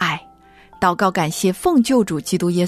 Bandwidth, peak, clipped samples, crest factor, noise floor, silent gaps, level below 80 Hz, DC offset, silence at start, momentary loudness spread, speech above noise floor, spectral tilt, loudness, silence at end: 14 kHz; -4 dBFS; under 0.1%; 14 dB; -47 dBFS; none; -50 dBFS; under 0.1%; 0 s; 5 LU; 30 dB; -5 dB/octave; -18 LUFS; 0 s